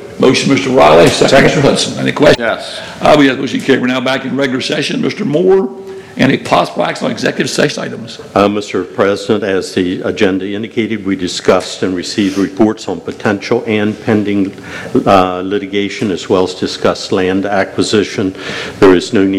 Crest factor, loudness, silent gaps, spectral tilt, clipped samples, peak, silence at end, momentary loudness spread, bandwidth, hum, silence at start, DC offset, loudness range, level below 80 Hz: 12 dB; -12 LUFS; none; -5 dB/octave; 0.7%; 0 dBFS; 0 s; 9 LU; 14.5 kHz; none; 0 s; under 0.1%; 5 LU; -44 dBFS